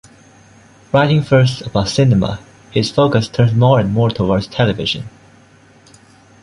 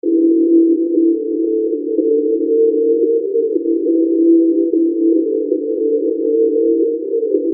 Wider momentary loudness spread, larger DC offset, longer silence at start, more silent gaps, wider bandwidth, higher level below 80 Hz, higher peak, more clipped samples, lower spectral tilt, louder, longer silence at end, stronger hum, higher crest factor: first, 9 LU vs 6 LU; neither; first, 0.95 s vs 0.05 s; neither; first, 11 kHz vs 0.6 kHz; first, -40 dBFS vs -88 dBFS; about the same, -2 dBFS vs -2 dBFS; neither; second, -6.5 dB/octave vs -16 dB/octave; about the same, -15 LUFS vs -15 LUFS; first, 1.35 s vs 0 s; neither; about the same, 14 dB vs 12 dB